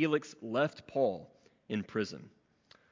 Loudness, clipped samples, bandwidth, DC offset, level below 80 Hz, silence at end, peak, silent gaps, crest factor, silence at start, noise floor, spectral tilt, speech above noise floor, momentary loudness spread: -35 LUFS; under 0.1%; 7.6 kHz; under 0.1%; -72 dBFS; 0.65 s; -16 dBFS; none; 20 dB; 0 s; -65 dBFS; -6 dB/octave; 32 dB; 8 LU